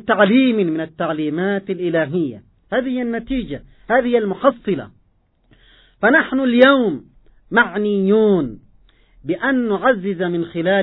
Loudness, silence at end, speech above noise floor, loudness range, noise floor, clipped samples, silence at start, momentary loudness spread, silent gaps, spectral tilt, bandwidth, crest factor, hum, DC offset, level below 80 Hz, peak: -18 LUFS; 0 s; 43 dB; 5 LU; -60 dBFS; under 0.1%; 0.05 s; 11 LU; none; -9.5 dB/octave; 4.1 kHz; 18 dB; none; under 0.1%; -48 dBFS; 0 dBFS